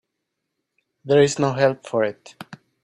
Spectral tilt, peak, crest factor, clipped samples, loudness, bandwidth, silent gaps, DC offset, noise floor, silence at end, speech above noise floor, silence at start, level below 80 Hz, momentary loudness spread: -5.5 dB/octave; -4 dBFS; 20 dB; under 0.1%; -20 LUFS; 11 kHz; none; under 0.1%; -79 dBFS; 0.3 s; 59 dB; 1.05 s; -64 dBFS; 23 LU